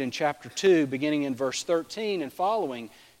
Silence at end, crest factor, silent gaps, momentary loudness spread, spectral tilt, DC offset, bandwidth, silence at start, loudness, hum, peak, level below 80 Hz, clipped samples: 0.3 s; 16 dB; none; 9 LU; -4.5 dB/octave; under 0.1%; 16 kHz; 0 s; -27 LUFS; none; -10 dBFS; -72 dBFS; under 0.1%